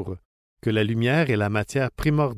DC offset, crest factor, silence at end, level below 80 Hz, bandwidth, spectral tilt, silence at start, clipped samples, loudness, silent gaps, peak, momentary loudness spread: under 0.1%; 14 dB; 0 s; -44 dBFS; 15.5 kHz; -7 dB/octave; 0 s; under 0.1%; -23 LUFS; 0.25-0.57 s; -10 dBFS; 11 LU